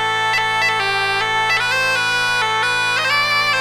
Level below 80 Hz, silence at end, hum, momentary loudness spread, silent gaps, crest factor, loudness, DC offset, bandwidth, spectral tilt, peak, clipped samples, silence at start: -52 dBFS; 0 s; none; 2 LU; none; 12 dB; -16 LUFS; under 0.1%; over 20 kHz; -1 dB/octave; -6 dBFS; under 0.1%; 0 s